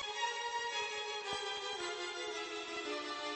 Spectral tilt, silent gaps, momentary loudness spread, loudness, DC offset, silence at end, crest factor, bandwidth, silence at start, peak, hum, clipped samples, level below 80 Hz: -0.5 dB/octave; none; 3 LU; -39 LUFS; under 0.1%; 0 s; 16 dB; 8.4 kHz; 0 s; -24 dBFS; none; under 0.1%; -76 dBFS